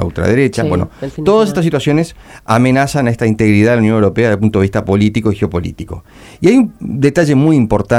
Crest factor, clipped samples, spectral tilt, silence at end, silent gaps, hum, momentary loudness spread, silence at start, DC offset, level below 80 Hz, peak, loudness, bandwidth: 12 dB; under 0.1%; -7 dB/octave; 0 s; none; none; 9 LU; 0 s; under 0.1%; -36 dBFS; 0 dBFS; -13 LUFS; 14.5 kHz